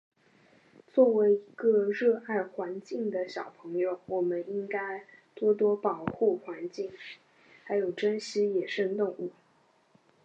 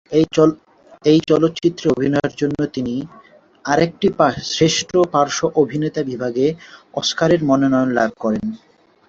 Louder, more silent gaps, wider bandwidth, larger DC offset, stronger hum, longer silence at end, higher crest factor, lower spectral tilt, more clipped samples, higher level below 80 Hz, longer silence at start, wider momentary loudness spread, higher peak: second, -30 LUFS vs -18 LUFS; neither; about the same, 8.4 kHz vs 8 kHz; neither; neither; first, 0.95 s vs 0.55 s; about the same, 20 dB vs 16 dB; about the same, -6 dB/octave vs -5 dB/octave; neither; second, -74 dBFS vs -52 dBFS; first, 0.95 s vs 0.1 s; first, 13 LU vs 9 LU; second, -12 dBFS vs -2 dBFS